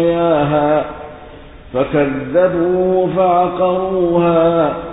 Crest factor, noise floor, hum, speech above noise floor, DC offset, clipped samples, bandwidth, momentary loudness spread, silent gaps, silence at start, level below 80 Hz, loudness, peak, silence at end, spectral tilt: 12 dB; -36 dBFS; none; 22 dB; under 0.1%; under 0.1%; 4 kHz; 7 LU; none; 0 s; -42 dBFS; -15 LUFS; -2 dBFS; 0 s; -12.5 dB/octave